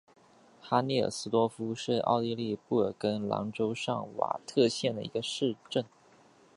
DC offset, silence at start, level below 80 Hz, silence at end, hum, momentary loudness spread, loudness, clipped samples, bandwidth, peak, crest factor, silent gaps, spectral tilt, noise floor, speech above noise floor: under 0.1%; 0.65 s; -70 dBFS; 0.7 s; none; 7 LU; -31 LUFS; under 0.1%; 11.5 kHz; -10 dBFS; 20 dB; none; -5.5 dB/octave; -60 dBFS; 30 dB